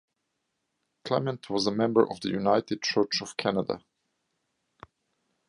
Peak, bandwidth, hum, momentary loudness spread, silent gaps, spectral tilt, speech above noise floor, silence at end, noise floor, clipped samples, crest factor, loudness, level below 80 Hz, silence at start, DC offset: -6 dBFS; 11.5 kHz; none; 7 LU; none; -5 dB/octave; 53 dB; 1.7 s; -80 dBFS; under 0.1%; 22 dB; -27 LUFS; -68 dBFS; 1.05 s; under 0.1%